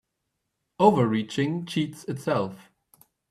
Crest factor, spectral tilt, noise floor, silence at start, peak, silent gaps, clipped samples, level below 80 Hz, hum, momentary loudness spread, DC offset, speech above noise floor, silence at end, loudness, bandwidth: 22 dB; -6.5 dB/octave; -80 dBFS; 0.8 s; -4 dBFS; none; under 0.1%; -66 dBFS; none; 11 LU; under 0.1%; 56 dB; 0.75 s; -25 LUFS; 14 kHz